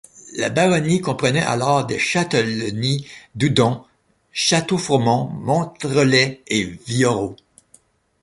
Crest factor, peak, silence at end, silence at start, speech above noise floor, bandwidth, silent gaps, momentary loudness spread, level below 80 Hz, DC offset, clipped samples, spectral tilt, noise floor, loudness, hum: 18 dB; -2 dBFS; 0.9 s; 0.15 s; 37 dB; 11.5 kHz; none; 8 LU; -52 dBFS; under 0.1%; under 0.1%; -4.5 dB/octave; -56 dBFS; -19 LUFS; none